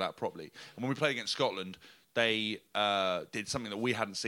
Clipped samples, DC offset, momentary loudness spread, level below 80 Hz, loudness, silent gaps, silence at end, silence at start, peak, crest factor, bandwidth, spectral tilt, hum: under 0.1%; under 0.1%; 13 LU; -72 dBFS; -33 LUFS; none; 0 s; 0 s; -12 dBFS; 22 dB; 17 kHz; -3.5 dB/octave; none